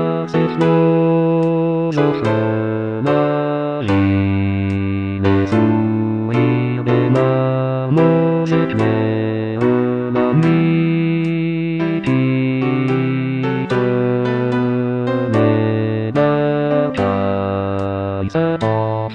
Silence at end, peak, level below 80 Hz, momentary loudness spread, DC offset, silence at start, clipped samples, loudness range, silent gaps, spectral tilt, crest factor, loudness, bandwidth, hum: 0 s; 0 dBFS; -52 dBFS; 5 LU; under 0.1%; 0 s; under 0.1%; 2 LU; none; -9 dB/octave; 14 dB; -17 LUFS; 7.6 kHz; none